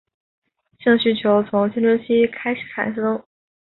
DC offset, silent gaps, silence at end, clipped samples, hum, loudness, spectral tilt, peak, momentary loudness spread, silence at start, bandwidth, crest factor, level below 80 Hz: under 0.1%; none; 0.55 s; under 0.1%; none; -19 LUFS; -10.5 dB/octave; -4 dBFS; 8 LU; 0.85 s; 4.2 kHz; 16 dB; -60 dBFS